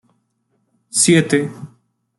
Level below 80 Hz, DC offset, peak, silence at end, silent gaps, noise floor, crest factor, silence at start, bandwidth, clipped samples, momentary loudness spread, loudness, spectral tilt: -60 dBFS; under 0.1%; -2 dBFS; 0.55 s; none; -67 dBFS; 18 dB; 0.95 s; 12.5 kHz; under 0.1%; 17 LU; -15 LUFS; -4 dB/octave